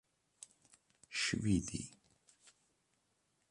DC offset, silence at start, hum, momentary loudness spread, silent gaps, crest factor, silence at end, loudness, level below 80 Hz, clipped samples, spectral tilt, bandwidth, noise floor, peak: under 0.1%; 1.1 s; none; 22 LU; none; 22 dB; 1.6 s; -38 LUFS; -60 dBFS; under 0.1%; -4 dB/octave; 11.5 kHz; -80 dBFS; -22 dBFS